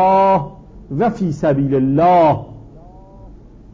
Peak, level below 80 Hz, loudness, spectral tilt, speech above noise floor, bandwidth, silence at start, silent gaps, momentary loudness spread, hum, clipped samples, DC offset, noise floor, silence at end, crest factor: -4 dBFS; -42 dBFS; -15 LUFS; -9 dB/octave; 25 dB; 7.6 kHz; 0 s; none; 15 LU; none; under 0.1%; under 0.1%; -39 dBFS; 0.35 s; 12 dB